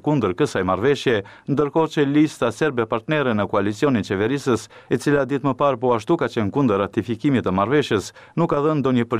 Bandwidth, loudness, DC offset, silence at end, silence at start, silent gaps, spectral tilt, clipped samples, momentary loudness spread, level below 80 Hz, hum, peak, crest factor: 14 kHz; -21 LUFS; 0.1%; 0 s; 0.05 s; none; -6.5 dB/octave; under 0.1%; 5 LU; -54 dBFS; none; -8 dBFS; 12 dB